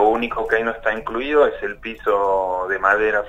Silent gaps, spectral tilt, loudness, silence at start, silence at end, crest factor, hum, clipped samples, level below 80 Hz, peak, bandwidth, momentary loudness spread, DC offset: none; -5.5 dB/octave; -20 LUFS; 0 s; 0 s; 18 dB; none; under 0.1%; -44 dBFS; -2 dBFS; 8 kHz; 8 LU; under 0.1%